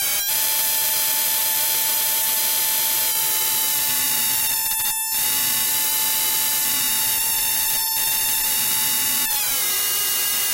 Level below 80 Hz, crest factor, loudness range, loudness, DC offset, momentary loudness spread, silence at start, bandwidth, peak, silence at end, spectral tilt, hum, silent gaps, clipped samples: -54 dBFS; 14 dB; 0 LU; -18 LUFS; under 0.1%; 1 LU; 0 s; 16.5 kHz; -8 dBFS; 0 s; 1.5 dB/octave; none; none; under 0.1%